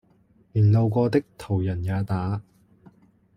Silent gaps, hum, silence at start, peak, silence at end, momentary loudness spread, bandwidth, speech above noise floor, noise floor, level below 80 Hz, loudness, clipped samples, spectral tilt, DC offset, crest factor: none; none; 0.55 s; -8 dBFS; 0.95 s; 11 LU; 9.8 kHz; 38 dB; -60 dBFS; -54 dBFS; -24 LUFS; under 0.1%; -9.5 dB/octave; under 0.1%; 16 dB